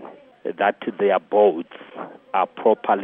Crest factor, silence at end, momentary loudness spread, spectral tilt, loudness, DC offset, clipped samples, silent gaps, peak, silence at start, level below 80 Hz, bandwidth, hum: 16 dB; 0 s; 19 LU; -8.5 dB/octave; -21 LUFS; under 0.1%; under 0.1%; none; -4 dBFS; 0 s; -78 dBFS; 3.8 kHz; none